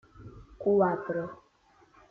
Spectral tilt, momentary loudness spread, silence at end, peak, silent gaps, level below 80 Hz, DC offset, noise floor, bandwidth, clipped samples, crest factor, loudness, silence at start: -10 dB/octave; 25 LU; 0.75 s; -12 dBFS; none; -60 dBFS; under 0.1%; -63 dBFS; 4.4 kHz; under 0.1%; 20 dB; -29 LUFS; 0.2 s